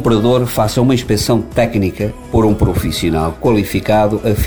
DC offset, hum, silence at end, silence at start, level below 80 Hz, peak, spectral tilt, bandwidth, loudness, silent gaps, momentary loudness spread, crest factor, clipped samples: 0.9%; none; 0 s; 0 s; -28 dBFS; -2 dBFS; -6 dB/octave; over 20 kHz; -14 LUFS; none; 4 LU; 12 dB; under 0.1%